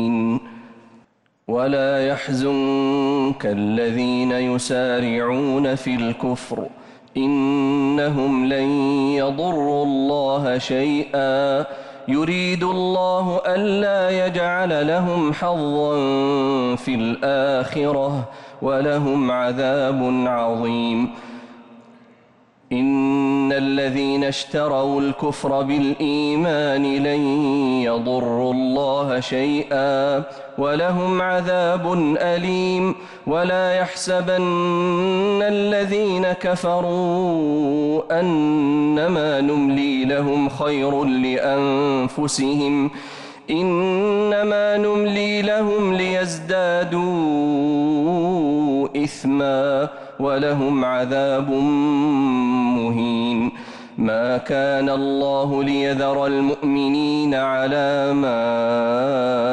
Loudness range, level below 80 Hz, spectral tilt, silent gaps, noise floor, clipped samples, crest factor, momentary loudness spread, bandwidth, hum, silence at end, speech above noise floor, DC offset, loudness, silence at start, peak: 2 LU; -56 dBFS; -6 dB/octave; none; -56 dBFS; under 0.1%; 8 dB; 4 LU; 11 kHz; none; 0 s; 37 dB; under 0.1%; -20 LUFS; 0 s; -12 dBFS